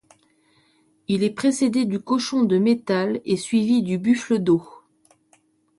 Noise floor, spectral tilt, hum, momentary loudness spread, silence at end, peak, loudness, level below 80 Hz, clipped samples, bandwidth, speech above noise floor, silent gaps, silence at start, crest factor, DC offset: -62 dBFS; -6 dB/octave; none; 4 LU; 1.1 s; -8 dBFS; -21 LUFS; -66 dBFS; under 0.1%; 11.5 kHz; 41 dB; none; 1.1 s; 14 dB; under 0.1%